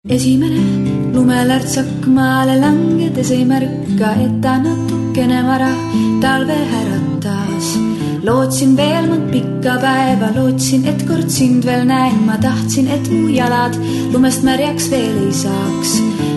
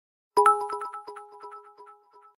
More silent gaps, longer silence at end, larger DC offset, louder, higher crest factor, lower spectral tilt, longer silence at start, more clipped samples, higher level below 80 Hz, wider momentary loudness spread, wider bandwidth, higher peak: neither; second, 0 s vs 0.55 s; neither; first, -14 LUFS vs -25 LUFS; second, 12 dB vs 22 dB; first, -5.5 dB/octave vs -2 dB/octave; second, 0.05 s vs 0.35 s; neither; first, -44 dBFS vs -78 dBFS; second, 5 LU vs 24 LU; second, 12.5 kHz vs 16 kHz; first, 0 dBFS vs -6 dBFS